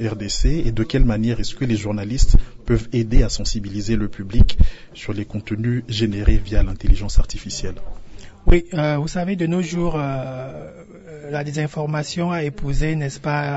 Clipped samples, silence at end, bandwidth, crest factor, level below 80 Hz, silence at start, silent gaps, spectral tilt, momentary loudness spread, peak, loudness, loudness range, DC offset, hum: under 0.1%; 0 s; 8 kHz; 14 dB; -22 dBFS; 0 s; none; -6 dB/octave; 10 LU; -2 dBFS; -22 LUFS; 3 LU; under 0.1%; none